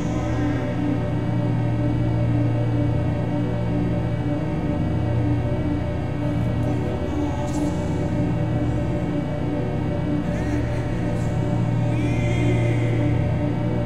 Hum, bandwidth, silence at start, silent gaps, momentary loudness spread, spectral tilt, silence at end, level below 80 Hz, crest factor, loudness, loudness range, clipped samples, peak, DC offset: none; 8.8 kHz; 0 s; none; 3 LU; -8.5 dB/octave; 0 s; -34 dBFS; 12 dB; -23 LUFS; 2 LU; under 0.1%; -10 dBFS; 2%